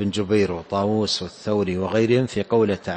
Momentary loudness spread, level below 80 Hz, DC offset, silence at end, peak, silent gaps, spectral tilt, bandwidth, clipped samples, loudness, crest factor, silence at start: 5 LU; -54 dBFS; under 0.1%; 0 s; -6 dBFS; none; -6 dB/octave; 8.8 kHz; under 0.1%; -22 LUFS; 14 dB; 0 s